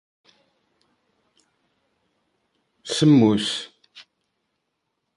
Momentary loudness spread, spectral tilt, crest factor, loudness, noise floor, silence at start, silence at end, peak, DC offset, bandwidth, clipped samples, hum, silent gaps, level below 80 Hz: 24 LU; -5.5 dB/octave; 20 dB; -19 LUFS; -77 dBFS; 2.85 s; 1.15 s; -6 dBFS; under 0.1%; 11.5 kHz; under 0.1%; none; none; -64 dBFS